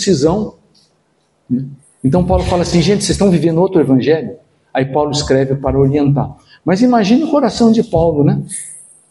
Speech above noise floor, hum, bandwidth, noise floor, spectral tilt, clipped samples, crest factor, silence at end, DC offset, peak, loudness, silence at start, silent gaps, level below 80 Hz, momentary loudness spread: 47 dB; none; 11.5 kHz; -59 dBFS; -6 dB/octave; under 0.1%; 14 dB; 0.3 s; under 0.1%; 0 dBFS; -14 LUFS; 0 s; none; -34 dBFS; 11 LU